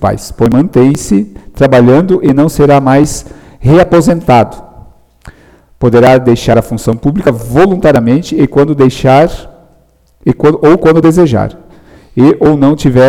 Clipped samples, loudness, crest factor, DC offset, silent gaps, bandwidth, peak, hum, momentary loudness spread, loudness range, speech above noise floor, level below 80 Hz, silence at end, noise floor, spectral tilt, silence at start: under 0.1%; -8 LUFS; 8 dB; under 0.1%; none; 16.5 kHz; 0 dBFS; none; 9 LU; 2 LU; 40 dB; -30 dBFS; 0 s; -47 dBFS; -7 dB/octave; 0 s